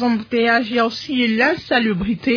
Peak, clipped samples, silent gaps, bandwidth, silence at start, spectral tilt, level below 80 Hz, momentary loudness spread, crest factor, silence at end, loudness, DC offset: -4 dBFS; under 0.1%; none; 5.4 kHz; 0 s; -6 dB/octave; -46 dBFS; 4 LU; 14 dB; 0 s; -18 LUFS; under 0.1%